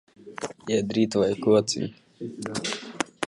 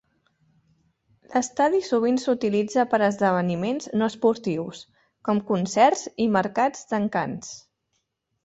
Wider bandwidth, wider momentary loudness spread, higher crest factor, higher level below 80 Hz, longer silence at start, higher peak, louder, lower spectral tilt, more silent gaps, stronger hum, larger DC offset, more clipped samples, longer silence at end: first, 11.5 kHz vs 8.2 kHz; first, 16 LU vs 11 LU; about the same, 22 dB vs 18 dB; about the same, -62 dBFS vs -66 dBFS; second, 0.2 s vs 1.3 s; about the same, -6 dBFS vs -6 dBFS; second, -26 LUFS vs -23 LUFS; about the same, -4.5 dB/octave vs -5.5 dB/octave; neither; neither; neither; neither; second, 0 s vs 0.85 s